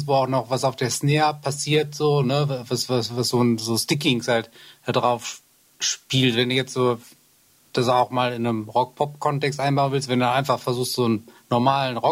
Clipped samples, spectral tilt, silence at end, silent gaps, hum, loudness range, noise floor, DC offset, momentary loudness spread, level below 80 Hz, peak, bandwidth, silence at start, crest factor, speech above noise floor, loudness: under 0.1%; -4.5 dB/octave; 0 s; none; none; 2 LU; -58 dBFS; under 0.1%; 6 LU; -64 dBFS; -6 dBFS; 16 kHz; 0 s; 16 dB; 36 dB; -22 LUFS